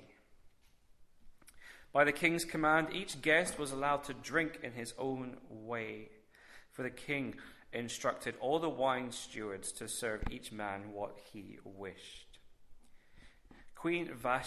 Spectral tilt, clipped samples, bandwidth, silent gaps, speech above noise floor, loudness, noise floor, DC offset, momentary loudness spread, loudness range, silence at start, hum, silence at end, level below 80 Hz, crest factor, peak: -4 dB/octave; under 0.1%; 13.5 kHz; none; 28 dB; -36 LUFS; -65 dBFS; under 0.1%; 20 LU; 12 LU; 0 s; none; 0 s; -60 dBFS; 24 dB; -14 dBFS